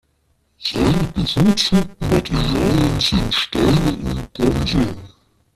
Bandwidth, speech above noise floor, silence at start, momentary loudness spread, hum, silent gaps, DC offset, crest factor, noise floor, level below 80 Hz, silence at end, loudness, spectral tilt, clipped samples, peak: 14.5 kHz; 46 dB; 0.6 s; 8 LU; none; none; under 0.1%; 16 dB; -63 dBFS; -30 dBFS; 0.5 s; -18 LUFS; -5.5 dB/octave; under 0.1%; -4 dBFS